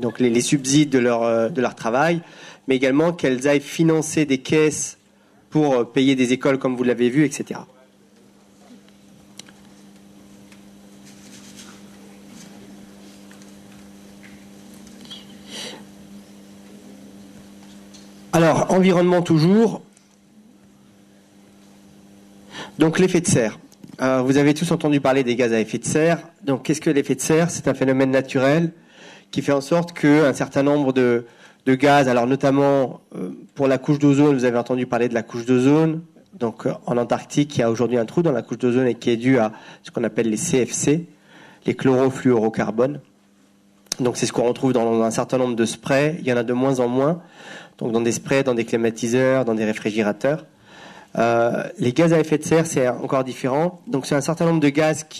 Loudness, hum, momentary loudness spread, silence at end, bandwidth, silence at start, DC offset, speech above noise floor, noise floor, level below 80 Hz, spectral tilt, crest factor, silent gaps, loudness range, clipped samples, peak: -20 LUFS; none; 12 LU; 0 s; 13.5 kHz; 0 s; under 0.1%; 37 dB; -56 dBFS; -58 dBFS; -5.5 dB/octave; 18 dB; none; 6 LU; under 0.1%; -2 dBFS